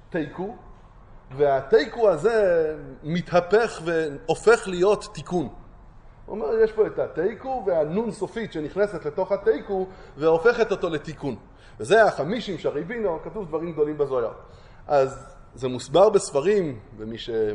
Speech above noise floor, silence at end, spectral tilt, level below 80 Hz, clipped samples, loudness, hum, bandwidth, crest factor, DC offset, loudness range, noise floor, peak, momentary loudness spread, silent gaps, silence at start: 24 dB; 0 s; -5.5 dB/octave; -50 dBFS; under 0.1%; -23 LUFS; none; 10.5 kHz; 18 dB; under 0.1%; 4 LU; -47 dBFS; -4 dBFS; 13 LU; none; 0.1 s